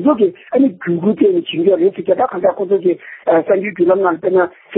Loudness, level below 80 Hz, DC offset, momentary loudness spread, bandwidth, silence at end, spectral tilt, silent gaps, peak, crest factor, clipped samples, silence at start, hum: -15 LUFS; -62 dBFS; under 0.1%; 4 LU; 4 kHz; 0 s; -12 dB/octave; none; 0 dBFS; 14 dB; under 0.1%; 0 s; none